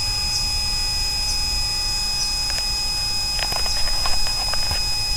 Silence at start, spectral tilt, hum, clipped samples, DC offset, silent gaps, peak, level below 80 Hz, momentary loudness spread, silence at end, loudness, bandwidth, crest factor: 0 s; -0.5 dB/octave; none; under 0.1%; under 0.1%; none; -6 dBFS; -30 dBFS; 1 LU; 0 s; -20 LUFS; 16 kHz; 16 dB